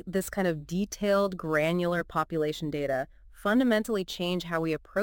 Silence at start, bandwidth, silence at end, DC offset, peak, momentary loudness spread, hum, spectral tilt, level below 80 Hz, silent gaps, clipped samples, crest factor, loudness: 0.05 s; 17 kHz; 0 s; under 0.1%; -12 dBFS; 6 LU; none; -5.5 dB/octave; -54 dBFS; none; under 0.1%; 16 dB; -29 LUFS